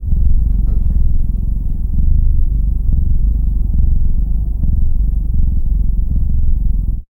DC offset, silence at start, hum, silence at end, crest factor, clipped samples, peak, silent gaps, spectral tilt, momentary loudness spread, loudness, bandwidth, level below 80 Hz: under 0.1%; 0 s; none; 0.1 s; 10 dB; under 0.1%; -2 dBFS; none; -12.5 dB/octave; 3 LU; -18 LUFS; 0.8 kHz; -12 dBFS